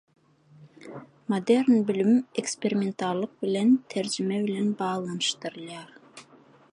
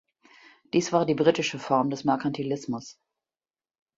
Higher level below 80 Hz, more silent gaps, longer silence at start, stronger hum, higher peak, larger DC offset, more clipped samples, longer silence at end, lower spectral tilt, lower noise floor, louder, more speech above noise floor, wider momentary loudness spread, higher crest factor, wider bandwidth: second, -76 dBFS vs -68 dBFS; neither; second, 0.6 s vs 0.75 s; neither; second, -10 dBFS vs -6 dBFS; neither; neither; second, 0.5 s vs 1.05 s; about the same, -5 dB/octave vs -5 dB/octave; second, -56 dBFS vs under -90 dBFS; about the same, -26 LUFS vs -26 LUFS; second, 30 dB vs over 65 dB; first, 18 LU vs 11 LU; about the same, 18 dB vs 22 dB; first, 11 kHz vs 7.8 kHz